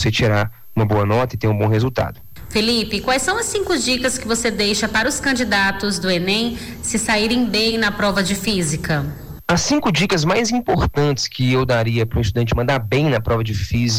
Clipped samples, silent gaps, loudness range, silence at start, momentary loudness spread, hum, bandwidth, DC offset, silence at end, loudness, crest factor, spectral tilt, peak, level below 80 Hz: under 0.1%; none; 1 LU; 0 s; 5 LU; none; 16.5 kHz; under 0.1%; 0 s; -18 LUFS; 10 dB; -4.5 dB/octave; -8 dBFS; -36 dBFS